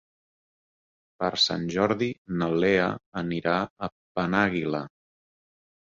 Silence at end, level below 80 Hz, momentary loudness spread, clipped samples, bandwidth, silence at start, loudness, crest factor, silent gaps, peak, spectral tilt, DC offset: 1.1 s; -58 dBFS; 10 LU; under 0.1%; 7.8 kHz; 1.2 s; -26 LUFS; 20 dB; 2.18-2.25 s, 3.06-3.12 s, 3.70-3.76 s, 3.92-4.15 s; -8 dBFS; -5 dB/octave; under 0.1%